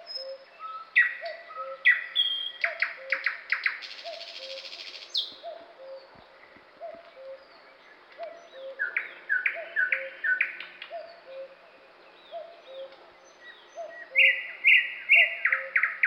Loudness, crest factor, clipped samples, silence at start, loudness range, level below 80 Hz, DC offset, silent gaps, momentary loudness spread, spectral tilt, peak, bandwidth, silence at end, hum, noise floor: -25 LUFS; 22 dB; under 0.1%; 0 s; 20 LU; -84 dBFS; under 0.1%; none; 25 LU; 0.5 dB/octave; -8 dBFS; 16.5 kHz; 0 s; none; -54 dBFS